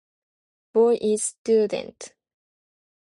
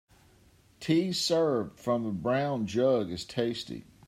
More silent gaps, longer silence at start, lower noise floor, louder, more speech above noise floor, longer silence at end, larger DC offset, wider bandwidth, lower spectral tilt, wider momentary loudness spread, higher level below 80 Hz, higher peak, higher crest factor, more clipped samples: first, 1.38-1.45 s vs none; about the same, 0.75 s vs 0.8 s; first, under -90 dBFS vs -61 dBFS; first, -22 LUFS vs -29 LUFS; first, over 68 dB vs 32 dB; first, 0.95 s vs 0.25 s; neither; second, 11.5 kHz vs 15.5 kHz; second, -4 dB/octave vs -5.5 dB/octave; first, 21 LU vs 8 LU; second, -72 dBFS vs -64 dBFS; first, -8 dBFS vs -14 dBFS; about the same, 16 dB vs 16 dB; neither